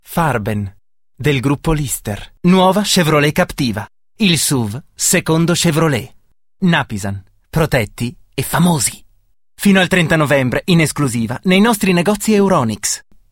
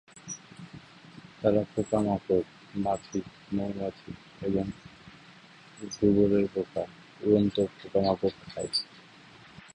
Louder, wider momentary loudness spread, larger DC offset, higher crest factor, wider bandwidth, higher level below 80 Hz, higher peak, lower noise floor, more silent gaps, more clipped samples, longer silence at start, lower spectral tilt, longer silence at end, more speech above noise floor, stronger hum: first, -15 LUFS vs -29 LUFS; second, 11 LU vs 24 LU; neither; about the same, 16 dB vs 20 dB; first, 17 kHz vs 10.5 kHz; first, -38 dBFS vs -56 dBFS; first, 0 dBFS vs -10 dBFS; about the same, -53 dBFS vs -53 dBFS; neither; neither; about the same, 0.1 s vs 0.15 s; second, -4.5 dB/octave vs -6 dB/octave; first, 0.3 s vs 0.15 s; first, 39 dB vs 25 dB; neither